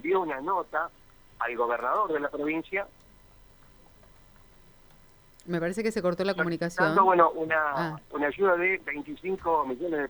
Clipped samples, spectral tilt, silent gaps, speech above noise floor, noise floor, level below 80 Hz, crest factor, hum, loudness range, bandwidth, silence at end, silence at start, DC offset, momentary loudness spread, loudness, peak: under 0.1%; -6 dB/octave; none; 29 dB; -56 dBFS; -58 dBFS; 20 dB; none; 12 LU; over 20 kHz; 0 s; 0.05 s; under 0.1%; 11 LU; -27 LUFS; -8 dBFS